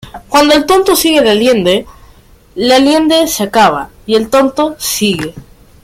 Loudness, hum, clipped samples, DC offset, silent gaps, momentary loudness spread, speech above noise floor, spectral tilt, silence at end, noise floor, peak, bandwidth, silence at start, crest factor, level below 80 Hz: -10 LUFS; none; under 0.1%; under 0.1%; none; 8 LU; 31 dB; -3.5 dB/octave; 0.45 s; -42 dBFS; 0 dBFS; 16.5 kHz; 0.05 s; 10 dB; -40 dBFS